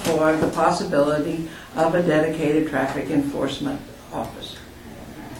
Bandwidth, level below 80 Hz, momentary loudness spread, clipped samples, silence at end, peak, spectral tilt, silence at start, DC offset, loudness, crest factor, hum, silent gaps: 17 kHz; -48 dBFS; 17 LU; under 0.1%; 0 s; -4 dBFS; -5.5 dB/octave; 0 s; under 0.1%; -22 LUFS; 18 dB; none; none